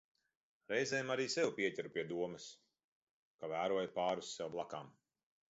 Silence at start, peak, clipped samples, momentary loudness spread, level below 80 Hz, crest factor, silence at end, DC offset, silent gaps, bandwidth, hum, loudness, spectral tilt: 0.7 s; -22 dBFS; under 0.1%; 14 LU; -82 dBFS; 18 dB; 0.6 s; under 0.1%; 2.84-3.39 s; 8 kHz; none; -40 LUFS; -2.5 dB/octave